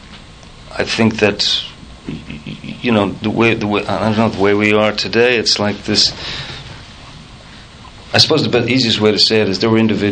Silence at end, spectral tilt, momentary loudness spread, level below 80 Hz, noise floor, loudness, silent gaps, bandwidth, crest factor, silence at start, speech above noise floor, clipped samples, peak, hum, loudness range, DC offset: 0 s; -4.5 dB/octave; 18 LU; -42 dBFS; -37 dBFS; -14 LUFS; none; 9.4 kHz; 16 dB; 0.05 s; 23 dB; under 0.1%; 0 dBFS; none; 3 LU; under 0.1%